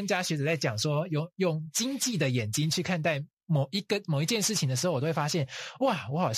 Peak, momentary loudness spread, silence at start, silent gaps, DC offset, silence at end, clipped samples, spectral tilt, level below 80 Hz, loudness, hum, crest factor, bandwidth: -14 dBFS; 4 LU; 0 s; 3.33-3.37 s; under 0.1%; 0 s; under 0.1%; -4.5 dB/octave; -70 dBFS; -29 LUFS; none; 14 dB; 14.5 kHz